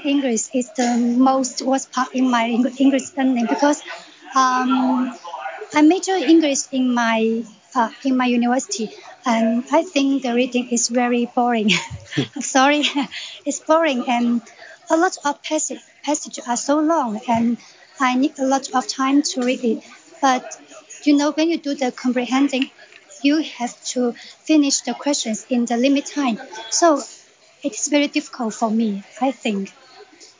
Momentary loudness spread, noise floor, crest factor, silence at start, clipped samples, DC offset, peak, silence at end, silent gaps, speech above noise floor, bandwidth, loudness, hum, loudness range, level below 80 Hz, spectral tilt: 10 LU; -45 dBFS; 16 dB; 0 s; under 0.1%; under 0.1%; -4 dBFS; 0.15 s; none; 26 dB; 7.8 kHz; -19 LUFS; none; 3 LU; -64 dBFS; -3 dB/octave